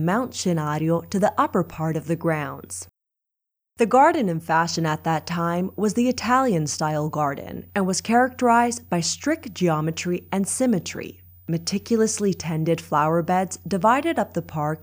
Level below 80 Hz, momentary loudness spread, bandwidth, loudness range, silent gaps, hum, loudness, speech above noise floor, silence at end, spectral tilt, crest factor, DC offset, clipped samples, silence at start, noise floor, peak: -60 dBFS; 8 LU; 16 kHz; 3 LU; none; none; -23 LUFS; 62 dB; 0 s; -5 dB/octave; 18 dB; under 0.1%; under 0.1%; 0 s; -84 dBFS; -6 dBFS